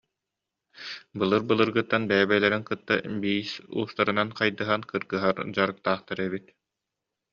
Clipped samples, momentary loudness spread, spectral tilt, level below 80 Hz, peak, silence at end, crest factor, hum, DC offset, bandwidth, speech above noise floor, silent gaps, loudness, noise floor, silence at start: under 0.1%; 10 LU; -3 dB/octave; -66 dBFS; -6 dBFS; 0.95 s; 22 dB; none; under 0.1%; 7.2 kHz; 60 dB; none; -26 LUFS; -86 dBFS; 0.75 s